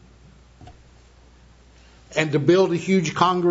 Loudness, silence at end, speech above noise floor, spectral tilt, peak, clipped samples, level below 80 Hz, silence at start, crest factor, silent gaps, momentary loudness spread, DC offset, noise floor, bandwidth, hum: -20 LUFS; 0 s; 32 dB; -6 dB/octave; -4 dBFS; under 0.1%; -54 dBFS; 0.6 s; 20 dB; none; 6 LU; under 0.1%; -51 dBFS; 8 kHz; none